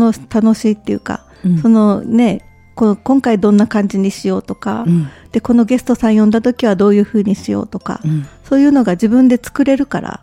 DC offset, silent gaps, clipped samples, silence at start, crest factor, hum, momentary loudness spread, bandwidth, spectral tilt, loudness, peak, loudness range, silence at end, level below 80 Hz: under 0.1%; none; under 0.1%; 0 s; 12 dB; none; 9 LU; 12 kHz; -7.5 dB/octave; -13 LUFS; 0 dBFS; 1 LU; 0.1 s; -44 dBFS